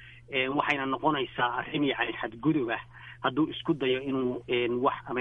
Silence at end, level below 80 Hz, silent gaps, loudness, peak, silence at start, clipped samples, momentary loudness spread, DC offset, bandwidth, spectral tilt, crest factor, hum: 0 s; -60 dBFS; none; -29 LUFS; -12 dBFS; 0 s; under 0.1%; 5 LU; under 0.1%; 7 kHz; -7 dB/octave; 18 dB; none